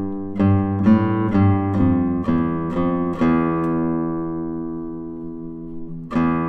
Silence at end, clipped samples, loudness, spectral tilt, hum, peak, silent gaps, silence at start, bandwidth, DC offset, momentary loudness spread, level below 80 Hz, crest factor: 0 s; under 0.1%; -20 LUFS; -10.5 dB/octave; none; -4 dBFS; none; 0 s; 6 kHz; under 0.1%; 15 LU; -44 dBFS; 16 dB